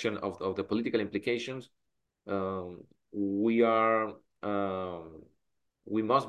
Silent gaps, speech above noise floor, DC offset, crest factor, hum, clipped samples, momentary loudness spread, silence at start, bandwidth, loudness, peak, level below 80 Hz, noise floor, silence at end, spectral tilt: none; 51 dB; under 0.1%; 18 dB; none; under 0.1%; 18 LU; 0 s; 11.5 kHz; -31 LUFS; -12 dBFS; -64 dBFS; -81 dBFS; 0 s; -6.5 dB/octave